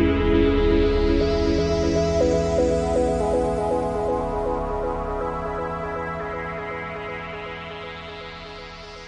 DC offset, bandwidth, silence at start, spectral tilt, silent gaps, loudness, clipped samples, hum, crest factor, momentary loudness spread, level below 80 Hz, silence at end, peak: under 0.1%; 10.5 kHz; 0 s; -6.5 dB/octave; none; -23 LUFS; under 0.1%; none; 16 dB; 15 LU; -32 dBFS; 0 s; -6 dBFS